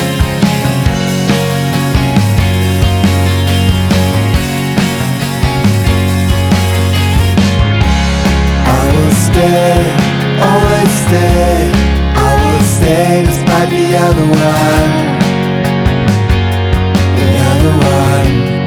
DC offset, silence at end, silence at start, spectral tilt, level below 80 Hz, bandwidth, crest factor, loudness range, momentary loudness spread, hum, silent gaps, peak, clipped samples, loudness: under 0.1%; 0 s; 0 s; -6 dB/octave; -18 dBFS; 19 kHz; 10 dB; 2 LU; 3 LU; none; none; 0 dBFS; under 0.1%; -10 LUFS